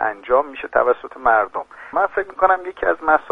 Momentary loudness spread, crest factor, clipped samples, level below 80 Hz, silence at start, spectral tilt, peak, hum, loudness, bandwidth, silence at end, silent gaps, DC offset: 5 LU; 18 dB; under 0.1%; -50 dBFS; 0 s; -6 dB/octave; -2 dBFS; none; -19 LUFS; 4.6 kHz; 0 s; none; under 0.1%